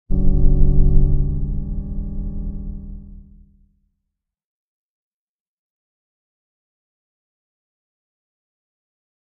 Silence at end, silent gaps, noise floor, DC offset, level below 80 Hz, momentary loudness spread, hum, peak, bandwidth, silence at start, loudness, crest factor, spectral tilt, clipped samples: 6.1 s; none; -79 dBFS; under 0.1%; -22 dBFS; 18 LU; none; 0 dBFS; 1.2 kHz; 0.1 s; -22 LUFS; 20 dB; -14 dB/octave; under 0.1%